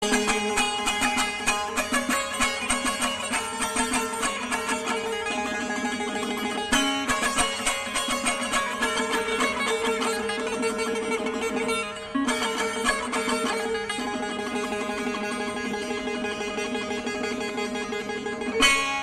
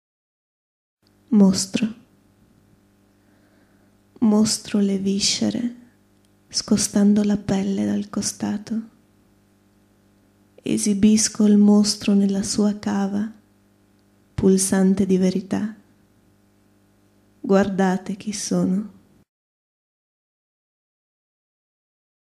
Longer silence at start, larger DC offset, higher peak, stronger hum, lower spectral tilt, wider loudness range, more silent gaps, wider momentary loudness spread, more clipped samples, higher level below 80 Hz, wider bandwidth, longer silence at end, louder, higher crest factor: second, 0 s vs 1.3 s; neither; about the same, -6 dBFS vs -4 dBFS; second, none vs 50 Hz at -45 dBFS; second, -1.5 dB/octave vs -5 dB/octave; second, 4 LU vs 7 LU; neither; second, 6 LU vs 11 LU; neither; about the same, -50 dBFS vs -54 dBFS; about the same, 14 kHz vs 13.5 kHz; second, 0 s vs 3.35 s; second, -26 LUFS vs -20 LUFS; about the same, 20 dB vs 20 dB